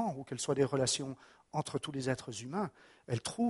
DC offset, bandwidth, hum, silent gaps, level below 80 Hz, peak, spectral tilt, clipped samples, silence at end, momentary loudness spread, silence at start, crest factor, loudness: under 0.1%; 11.5 kHz; none; none; -68 dBFS; -16 dBFS; -4.5 dB/octave; under 0.1%; 0 s; 10 LU; 0 s; 20 dB; -36 LUFS